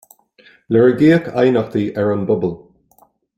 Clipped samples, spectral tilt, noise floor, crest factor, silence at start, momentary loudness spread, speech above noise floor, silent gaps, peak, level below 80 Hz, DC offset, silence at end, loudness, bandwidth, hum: under 0.1%; -8.5 dB/octave; -55 dBFS; 16 dB; 0.7 s; 9 LU; 40 dB; none; -2 dBFS; -54 dBFS; under 0.1%; 0.8 s; -16 LUFS; 15 kHz; none